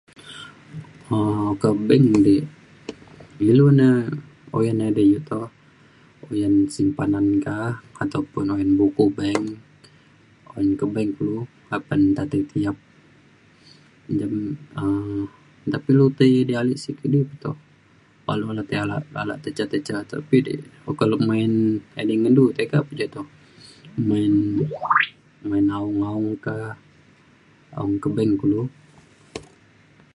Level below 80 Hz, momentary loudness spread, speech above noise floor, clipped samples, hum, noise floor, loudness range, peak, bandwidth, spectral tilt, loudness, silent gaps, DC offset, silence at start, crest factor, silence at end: -54 dBFS; 19 LU; 34 dB; under 0.1%; none; -55 dBFS; 7 LU; -2 dBFS; 11 kHz; -8 dB/octave; -21 LUFS; none; under 0.1%; 0.25 s; 20 dB; 0.75 s